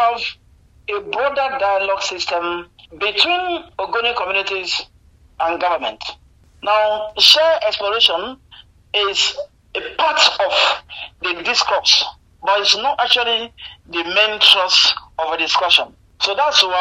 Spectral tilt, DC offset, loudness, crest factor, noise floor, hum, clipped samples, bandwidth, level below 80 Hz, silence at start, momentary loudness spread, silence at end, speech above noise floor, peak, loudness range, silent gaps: 0 dB/octave; under 0.1%; -16 LUFS; 18 dB; -46 dBFS; none; under 0.1%; 15.5 kHz; -52 dBFS; 0 s; 14 LU; 0 s; 29 dB; 0 dBFS; 6 LU; none